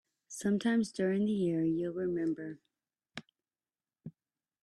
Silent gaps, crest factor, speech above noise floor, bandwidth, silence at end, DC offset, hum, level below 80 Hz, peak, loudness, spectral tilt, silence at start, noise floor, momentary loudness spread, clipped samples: none; 16 dB; over 58 dB; 12 kHz; 0.5 s; under 0.1%; none; -74 dBFS; -20 dBFS; -33 LUFS; -6.5 dB/octave; 0.3 s; under -90 dBFS; 22 LU; under 0.1%